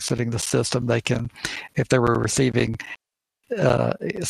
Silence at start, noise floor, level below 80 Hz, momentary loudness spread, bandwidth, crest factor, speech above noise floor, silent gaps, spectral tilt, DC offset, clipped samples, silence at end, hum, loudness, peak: 0 s; -59 dBFS; -48 dBFS; 11 LU; 15 kHz; 20 dB; 37 dB; none; -5 dB/octave; under 0.1%; under 0.1%; 0 s; none; -23 LUFS; -4 dBFS